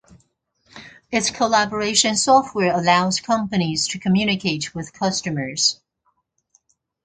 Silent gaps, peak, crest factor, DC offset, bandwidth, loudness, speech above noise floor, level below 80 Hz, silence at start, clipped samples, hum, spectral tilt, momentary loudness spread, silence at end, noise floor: none; -2 dBFS; 18 dB; under 0.1%; 9.6 kHz; -19 LUFS; 49 dB; -56 dBFS; 0.75 s; under 0.1%; none; -3.5 dB/octave; 8 LU; 1.3 s; -69 dBFS